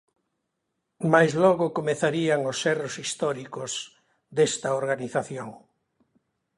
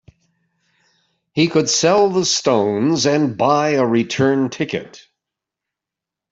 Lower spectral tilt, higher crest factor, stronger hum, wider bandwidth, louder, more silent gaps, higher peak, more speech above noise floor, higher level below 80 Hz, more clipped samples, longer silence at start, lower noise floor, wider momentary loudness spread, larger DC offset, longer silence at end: about the same, -4.5 dB/octave vs -4 dB/octave; first, 22 dB vs 16 dB; neither; first, 11.5 kHz vs 8 kHz; second, -25 LUFS vs -17 LUFS; neither; about the same, -4 dBFS vs -2 dBFS; second, 55 dB vs 69 dB; second, -68 dBFS vs -60 dBFS; neither; second, 1 s vs 1.35 s; second, -80 dBFS vs -85 dBFS; first, 13 LU vs 8 LU; neither; second, 1 s vs 1.35 s